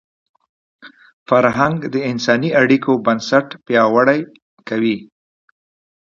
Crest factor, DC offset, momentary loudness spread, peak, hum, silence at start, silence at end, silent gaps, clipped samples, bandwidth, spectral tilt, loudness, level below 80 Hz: 18 dB; under 0.1%; 8 LU; 0 dBFS; none; 0.85 s; 1 s; 1.13-1.26 s, 4.42-4.57 s; under 0.1%; 7.4 kHz; -6 dB/octave; -16 LUFS; -58 dBFS